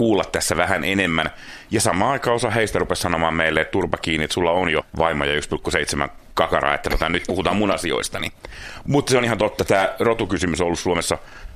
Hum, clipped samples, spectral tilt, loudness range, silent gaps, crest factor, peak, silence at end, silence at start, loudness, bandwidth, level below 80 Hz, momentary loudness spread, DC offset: none; under 0.1%; -4 dB/octave; 1 LU; none; 20 dB; 0 dBFS; 0 s; 0 s; -20 LUFS; 14.5 kHz; -38 dBFS; 7 LU; under 0.1%